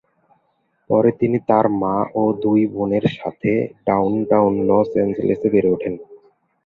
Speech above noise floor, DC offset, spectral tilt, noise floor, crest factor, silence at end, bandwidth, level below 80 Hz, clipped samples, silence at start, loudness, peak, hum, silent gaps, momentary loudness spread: 48 dB; under 0.1%; -10 dB/octave; -66 dBFS; 18 dB; 0.5 s; 4.8 kHz; -52 dBFS; under 0.1%; 0.9 s; -18 LUFS; 0 dBFS; none; none; 5 LU